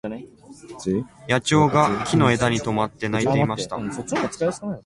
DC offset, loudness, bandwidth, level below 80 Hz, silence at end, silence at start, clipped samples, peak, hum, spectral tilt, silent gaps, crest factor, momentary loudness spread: under 0.1%; -22 LUFS; 11.5 kHz; -50 dBFS; 0.05 s; 0.05 s; under 0.1%; -4 dBFS; none; -5.5 dB/octave; none; 18 dB; 11 LU